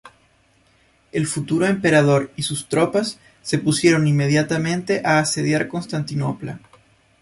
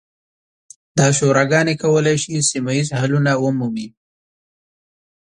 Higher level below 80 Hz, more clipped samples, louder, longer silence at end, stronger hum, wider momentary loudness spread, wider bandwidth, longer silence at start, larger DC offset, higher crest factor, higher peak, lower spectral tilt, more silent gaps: about the same, -56 dBFS vs -56 dBFS; neither; second, -20 LUFS vs -17 LUFS; second, 0.65 s vs 1.35 s; neither; about the same, 11 LU vs 9 LU; about the same, 11.5 kHz vs 11 kHz; second, 0.05 s vs 0.95 s; neither; about the same, 18 dB vs 18 dB; about the same, -2 dBFS vs 0 dBFS; about the same, -5 dB/octave vs -5 dB/octave; neither